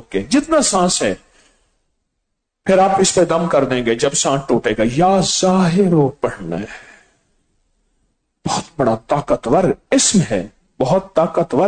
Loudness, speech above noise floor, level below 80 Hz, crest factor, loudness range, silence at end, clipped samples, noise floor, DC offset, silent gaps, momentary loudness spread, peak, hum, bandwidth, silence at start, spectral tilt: -16 LUFS; 58 dB; -44 dBFS; 14 dB; 7 LU; 0 s; under 0.1%; -74 dBFS; under 0.1%; none; 10 LU; -4 dBFS; none; 9.4 kHz; 0.1 s; -4.5 dB/octave